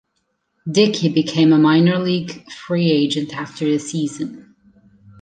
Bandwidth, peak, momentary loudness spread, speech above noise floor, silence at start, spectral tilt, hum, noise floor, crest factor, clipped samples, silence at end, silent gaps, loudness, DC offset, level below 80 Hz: 9.4 kHz; -2 dBFS; 16 LU; 53 dB; 0.65 s; -6 dB/octave; none; -70 dBFS; 16 dB; under 0.1%; 0.8 s; none; -17 LUFS; under 0.1%; -62 dBFS